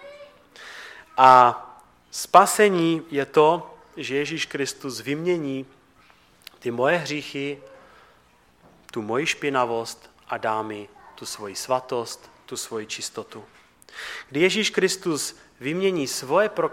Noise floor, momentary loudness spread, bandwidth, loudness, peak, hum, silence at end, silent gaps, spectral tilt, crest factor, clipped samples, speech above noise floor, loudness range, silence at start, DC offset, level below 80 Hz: -58 dBFS; 21 LU; 17 kHz; -22 LUFS; -2 dBFS; none; 0 s; none; -3.5 dB/octave; 22 dB; under 0.1%; 35 dB; 11 LU; 0 s; under 0.1%; -66 dBFS